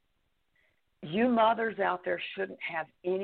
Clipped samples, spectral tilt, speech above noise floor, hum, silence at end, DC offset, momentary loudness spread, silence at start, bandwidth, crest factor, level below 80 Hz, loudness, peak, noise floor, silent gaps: under 0.1%; -8.5 dB/octave; 45 dB; none; 0 s; under 0.1%; 11 LU; 1 s; 4.5 kHz; 18 dB; -72 dBFS; -30 LUFS; -14 dBFS; -75 dBFS; none